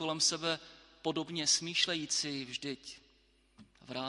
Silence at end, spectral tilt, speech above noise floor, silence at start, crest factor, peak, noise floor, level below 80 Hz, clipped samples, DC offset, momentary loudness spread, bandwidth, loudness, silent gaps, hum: 0 s; -1.5 dB/octave; 34 dB; 0 s; 22 dB; -16 dBFS; -69 dBFS; -72 dBFS; under 0.1%; under 0.1%; 15 LU; 11.5 kHz; -33 LUFS; none; none